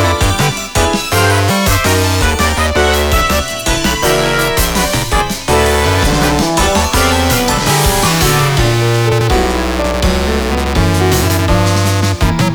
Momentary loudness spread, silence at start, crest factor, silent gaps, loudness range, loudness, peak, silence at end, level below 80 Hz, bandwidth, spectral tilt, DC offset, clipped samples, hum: 3 LU; 0 s; 12 dB; none; 1 LU; -12 LUFS; 0 dBFS; 0 s; -20 dBFS; over 20 kHz; -4 dB/octave; under 0.1%; under 0.1%; none